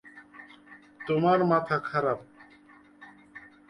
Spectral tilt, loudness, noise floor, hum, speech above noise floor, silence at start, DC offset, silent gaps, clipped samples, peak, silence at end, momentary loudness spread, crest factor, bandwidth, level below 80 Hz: -8.5 dB/octave; -26 LUFS; -56 dBFS; none; 30 dB; 0.15 s; under 0.1%; none; under 0.1%; -10 dBFS; 0.3 s; 25 LU; 20 dB; 11 kHz; -68 dBFS